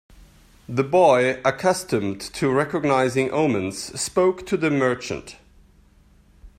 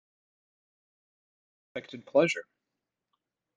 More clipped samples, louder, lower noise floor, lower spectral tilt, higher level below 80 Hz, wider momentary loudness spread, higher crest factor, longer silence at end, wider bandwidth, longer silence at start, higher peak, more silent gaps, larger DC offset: neither; first, -21 LUFS vs -28 LUFS; second, -54 dBFS vs -87 dBFS; about the same, -5 dB/octave vs -5 dB/octave; first, -54 dBFS vs -80 dBFS; second, 11 LU vs 17 LU; second, 18 dB vs 24 dB; second, 0.1 s vs 1.15 s; first, 15.5 kHz vs 9.4 kHz; second, 0.7 s vs 1.75 s; first, -4 dBFS vs -12 dBFS; neither; neither